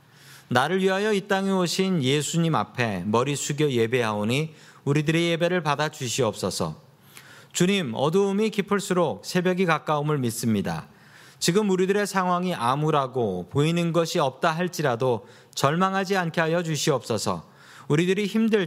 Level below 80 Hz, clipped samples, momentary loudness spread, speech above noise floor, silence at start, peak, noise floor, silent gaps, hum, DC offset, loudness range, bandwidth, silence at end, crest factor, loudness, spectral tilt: -64 dBFS; under 0.1%; 5 LU; 26 dB; 0.25 s; -2 dBFS; -50 dBFS; none; none; under 0.1%; 2 LU; 16 kHz; 0 s; 22 dB; -24 LUFS; -5 dB/octave